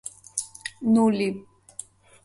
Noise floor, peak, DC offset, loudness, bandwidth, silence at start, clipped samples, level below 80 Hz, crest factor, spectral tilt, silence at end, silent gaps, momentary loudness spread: -45 dBFS; -4 dBFS; under 0.1%; -24 LUFS; 11.5 kHz; 0.05 s; under 0.1%; -66 dBFS; 22 dB; -5 dB/octave; 0.85 s; none; 21 LU